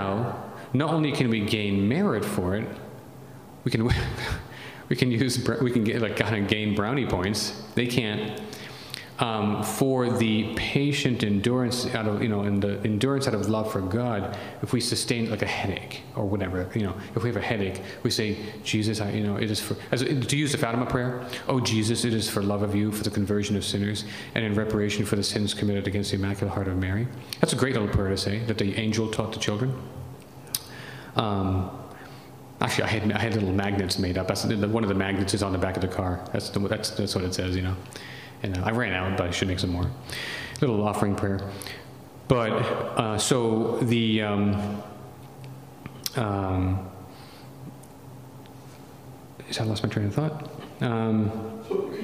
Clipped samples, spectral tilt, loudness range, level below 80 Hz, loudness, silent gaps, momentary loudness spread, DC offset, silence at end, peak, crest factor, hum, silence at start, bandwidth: under 0.1%; -5.5 dB/octave; 5 LU; -50 dBFS; -26 LUFS; none; 16 LU; under 0.1%; 0 s; -2 dBFS; 24 dB; none; 0 s; 15.5 kHz